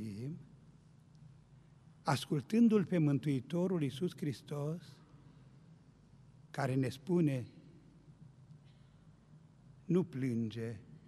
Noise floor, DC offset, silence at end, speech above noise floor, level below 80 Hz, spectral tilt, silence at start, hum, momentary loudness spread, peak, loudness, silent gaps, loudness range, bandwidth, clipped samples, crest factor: -62 dBFS; under 0.1%; 0.1 s; 28 dB; -72 dBFS; -7.5 dB/octave; 0 s; none; 16 LU; -18 dBFS; -36 LUFS; none; 7 LU; 13 kHz; under 0.1%; 20 dB